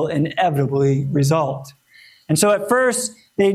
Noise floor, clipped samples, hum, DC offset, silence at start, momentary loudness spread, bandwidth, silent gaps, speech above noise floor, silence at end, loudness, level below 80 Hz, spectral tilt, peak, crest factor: -45 dBFS; under 0.1%; none; under 0.1%; 0 s; 8 LU; 15 kHz; none; 26 dB; 0 s; -18 LUFS; -58 dBFS; -5 dB/octave; -4 dBFS; 16 dB